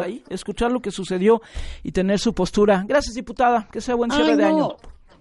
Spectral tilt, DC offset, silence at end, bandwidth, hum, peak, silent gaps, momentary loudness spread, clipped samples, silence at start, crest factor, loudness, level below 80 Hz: -5.5 dB/octave; under 0.1%; 0.3 s; 11.5 kHz; none; -4 dBFS; none; 12 LU; under 0.1%; 0 s; 16 dB; -21 LUFS; -40 dBFS